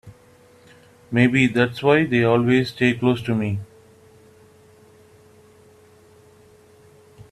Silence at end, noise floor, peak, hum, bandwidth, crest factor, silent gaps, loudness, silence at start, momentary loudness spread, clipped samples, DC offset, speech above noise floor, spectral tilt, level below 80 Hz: 0.1 s; -52 dBFS; -2 dBFS; none; 12.5 kHz; 20 dB; none; -19 LUFS; 0.05 s; 8 LU; under 0.1%; under 0.1%; 33 dB; -7 dB/octave; -58 dBFS